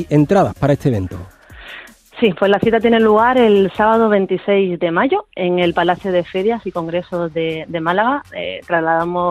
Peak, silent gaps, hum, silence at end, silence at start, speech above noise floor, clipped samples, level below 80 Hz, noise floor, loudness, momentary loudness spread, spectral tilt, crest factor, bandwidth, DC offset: -2 dBFS; none; none; 0 s; 0 s; 22 dB; under 0.1%; -46 dBFS; -37 dBFS; -16 LUFS; 10 LU; -7.5 dB/octave; 14 dB; 13.5 kHz; under 0.1%